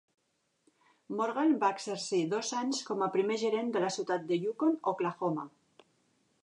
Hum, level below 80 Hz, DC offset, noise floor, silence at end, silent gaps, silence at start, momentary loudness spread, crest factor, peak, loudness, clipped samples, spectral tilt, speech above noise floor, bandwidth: none; -86 dBFS; under 0.1%; -74 dBFS; 0.95 s; none; 1.1 s; 6 LU; 18 dB; -16 dBFS; -32 LUFS; under 0.1%; -4.5 dB/octave; 43 dB; 11 kHz